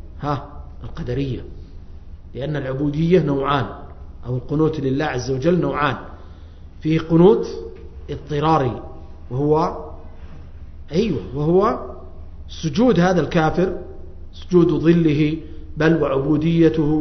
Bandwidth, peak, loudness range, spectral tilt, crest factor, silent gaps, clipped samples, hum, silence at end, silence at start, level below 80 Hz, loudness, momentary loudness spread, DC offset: 6.4 kHz; -2 dBFS; 5 LU; -8 dB/octave; 18 dB; none; under 0.1%; none; 0 s; 0 s; -36 dBFS; -19 LUFS; 23 LU; under 0.1%